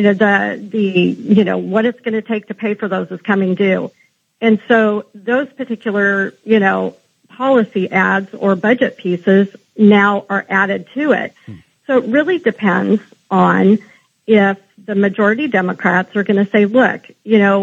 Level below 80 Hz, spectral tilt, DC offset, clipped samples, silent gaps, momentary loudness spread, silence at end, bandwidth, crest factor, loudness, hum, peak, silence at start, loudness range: -70 dBFS; -8 dB/octave; under 0.1%; under 0.1%; none; 9 LU; 0 s; 7.2 kHz; 14 dB; -15 LUFS; none; 0 dBFS; 0 s; 3 LU